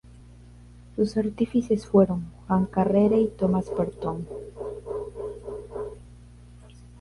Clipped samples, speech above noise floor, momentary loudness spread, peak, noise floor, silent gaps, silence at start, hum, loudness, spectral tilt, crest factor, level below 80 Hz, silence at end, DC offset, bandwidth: under 0.1%; 24 dB; 16 LU; -8 dBFS; -48 dBFS; none; 0.2 s; 60 Hz at -45 dBFS; -26 LUFS; -9 dB/octave; 18 dB; -48 dBFS; 0 s; under 0.1%; 11.5 kHz